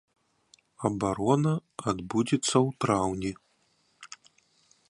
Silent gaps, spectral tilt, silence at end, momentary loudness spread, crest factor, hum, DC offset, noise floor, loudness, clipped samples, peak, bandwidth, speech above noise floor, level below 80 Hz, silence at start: none; -5.5 dB/octave; 0.85 s; 22 LU; 22 dB; none; under 0.1%; -69 dBFS; -28 LUFS; under 0.1%; -8 dBFS; 11.5 kHz; 42 dB; -58 dBFS; 0.8 s